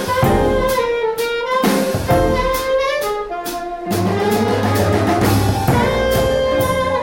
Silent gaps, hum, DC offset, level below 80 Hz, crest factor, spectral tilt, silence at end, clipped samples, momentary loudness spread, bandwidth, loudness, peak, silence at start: none; none; under 0.1%; -30 dBFS; 12 dB; -5.5 dB/octave; 0 s; under 0.1%; 6 LU; 17 kHz; -17 LUFS; -4 dBFS; 0 s